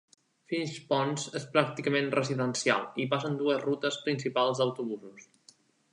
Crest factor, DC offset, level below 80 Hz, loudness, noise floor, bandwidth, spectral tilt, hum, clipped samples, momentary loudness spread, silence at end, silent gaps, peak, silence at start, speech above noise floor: 24 dB; under 0.1%; -80 dBFS; -30 LUFS; -62 dBFS; 11 kHz; -4.5 dB/octave; none; under 0.1%; 7 LU; 0.7 s; none; -6 dBFS; 0.5 s; 32 dB